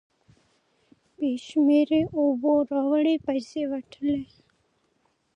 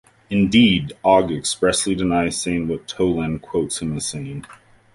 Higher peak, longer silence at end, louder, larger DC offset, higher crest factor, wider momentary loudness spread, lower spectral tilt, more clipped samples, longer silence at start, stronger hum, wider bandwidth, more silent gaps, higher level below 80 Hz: second, -10 dBFS vs -2 dBFS; first, 1.1 s vs 0.4 s; second, -25 LUFS vs -19 LUFS; neither; about the same, 16 dB vs 18 dB; about the same, 10 LU vs 11 LU; first, -6.5 dB/octave vs -4.5 dB/octave; neither; first, 1.2 s vs 0.3 s; neither; second, 8.4 kHz vs 11.5 kHz; neither; second, -64 dBFS vs -44 dBFS